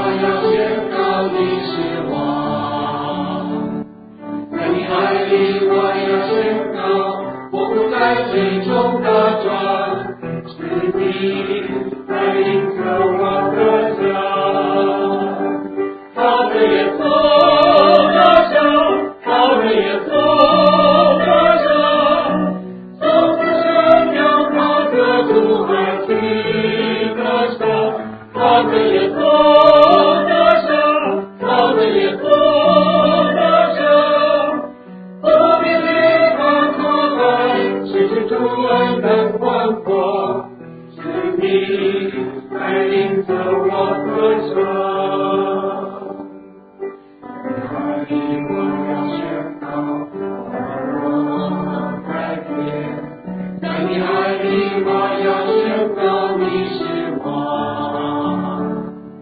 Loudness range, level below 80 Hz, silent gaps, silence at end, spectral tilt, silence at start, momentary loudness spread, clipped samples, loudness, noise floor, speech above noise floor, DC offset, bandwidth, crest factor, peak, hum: 10 LU; -52 dBFS; none; 0 s; -8.5 dB/octave; 0 s; 13 LU; under 0.1%; -15 LUFS; -39 dBFS; 23 dB; under 0.1%; 5 kHz; 16 dB; 0 dBFS; none